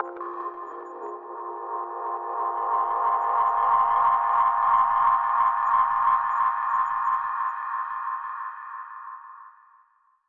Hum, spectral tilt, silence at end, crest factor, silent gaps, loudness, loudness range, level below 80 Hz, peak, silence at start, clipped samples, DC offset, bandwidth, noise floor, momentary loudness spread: none; -5.5 dB/octave; 0.8 s; 14 dB; none; -24 LUFS; 8 LU; -68 dBFS; -10 dBFS; 0 s; under 0.1%; under 0.1%; 3.9 kHz; -63 dBFS; 16 LU